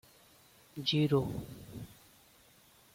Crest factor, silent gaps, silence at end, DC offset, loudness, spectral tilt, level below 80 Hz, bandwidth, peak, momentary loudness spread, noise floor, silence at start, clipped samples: 20 dB; none; 1 s; under 0.1%; -32 LUFS; -6.5 dB/octave; -62 dBFS; 16.5 kHz; -18 dBFS; 21 LU; -63 dBFS; 0.75 s; under 0.1%